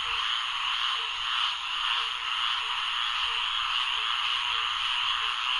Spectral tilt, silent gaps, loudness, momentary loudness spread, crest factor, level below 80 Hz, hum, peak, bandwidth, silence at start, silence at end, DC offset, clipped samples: 2.5 dB/octave; none; -26 LUFS; 2 LU; 14 dB; -58 dBFS; none; -14 dBFS; 11.5 kHz; 0 s; 0 s; under 0.1%; under 0.1%